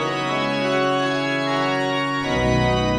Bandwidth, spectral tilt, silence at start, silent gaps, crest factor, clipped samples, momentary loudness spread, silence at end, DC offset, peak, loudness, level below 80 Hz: 12 kHz; -5.5 dB/octave; 0 s; none; 14 dB; under 0.1%; 3 LU; 0 s; under 0.1%; -8 dBFS; -21 LUFS; -38 dBFS